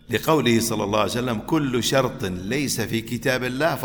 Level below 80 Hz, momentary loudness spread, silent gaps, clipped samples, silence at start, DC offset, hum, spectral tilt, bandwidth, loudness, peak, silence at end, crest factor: -48 dBFS; 6 LU; none; under 0.1%; 0.1 s; under 0.1%; none; -4.5 dB/octave; over 20 kHz; -22 LUFS; -4 dBFS; 0 s; 18 dB